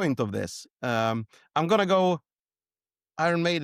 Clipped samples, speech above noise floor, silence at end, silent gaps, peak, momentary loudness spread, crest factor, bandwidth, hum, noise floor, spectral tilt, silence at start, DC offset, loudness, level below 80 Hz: under 0.1%; over 64 dB; 0 s; 0.71-0.76 s; -12 dBFS; 12 LU; 16 dB; 14.5 kHz; none; under -90 dBFS; -5.5 dB/octave; 0 s; under 0.1%; -26 LUFS; -66 dBFS